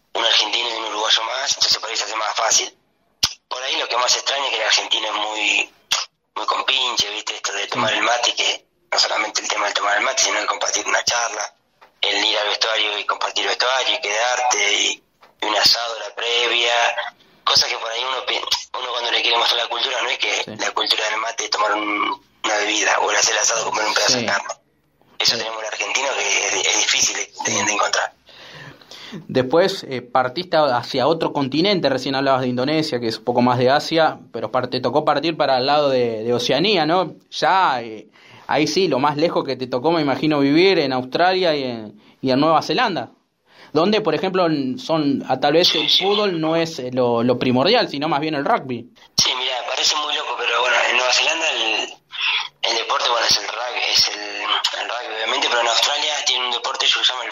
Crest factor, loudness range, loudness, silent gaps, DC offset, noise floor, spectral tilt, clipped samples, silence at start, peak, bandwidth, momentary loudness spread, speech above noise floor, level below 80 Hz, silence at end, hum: 18 dB; 2 LU; -18 LUFS; none; under 0.1%; -60 dBFS; -2 dB/octave; under 0.1%; 0.15 s; -2 dBFS; 16 kHz; 8 LU; 41 dB; -62 dBFS; 0 s; none